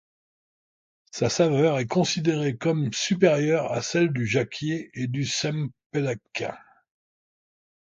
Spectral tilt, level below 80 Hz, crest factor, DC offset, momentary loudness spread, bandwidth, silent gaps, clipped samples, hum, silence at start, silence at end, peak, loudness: -5 dB/octave; -62 dBFS; 20 dB; under 0.1%; 10 LU; 9.2 kHz; 5.86-5.90 s; under 0.1%; none; 1.15 s; 1.35 s; -6 dBFS; -25 LUFS